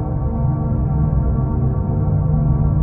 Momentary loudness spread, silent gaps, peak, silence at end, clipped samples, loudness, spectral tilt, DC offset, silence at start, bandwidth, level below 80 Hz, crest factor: 3 LU; none; -4 dBFS; 0 s; under 0.1%; -19 LUFS; -15 dB/octave; under 0.1%; 0 s; 2.2 kHz; -22 dBFS; 12 dB